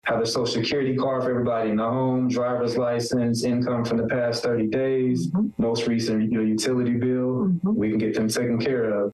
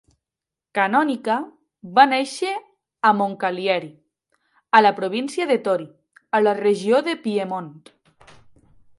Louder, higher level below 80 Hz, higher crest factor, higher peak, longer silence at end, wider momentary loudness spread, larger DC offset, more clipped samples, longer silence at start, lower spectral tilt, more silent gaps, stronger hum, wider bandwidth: second, -23 LUFS vs -20 LUFS; first, -58 dBFS vs -70 dBFS; second, 8 dB vs 22 dB; second, -16 dBFS vs 0 dBFS; second, 0 s vs 1.2 s; second, 1 LU vs 13 LU; neither; neither; second, 0.05 s vs 0.75 s; first, -6 dB/octave vs -4.5 dB/octave; neither; neither; about the same, 12.5 kHz vs 11.5 kHz